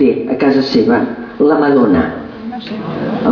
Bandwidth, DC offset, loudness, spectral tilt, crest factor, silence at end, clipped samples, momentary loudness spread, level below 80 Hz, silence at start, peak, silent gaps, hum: 5.4 kHz; under 0.1%; -13 LUFS; -7.5 dB/octave; 12 dB; 0 s; under 0.1%; 14 LU; -44 dBFS; 0 s; 0 dBFS; none; none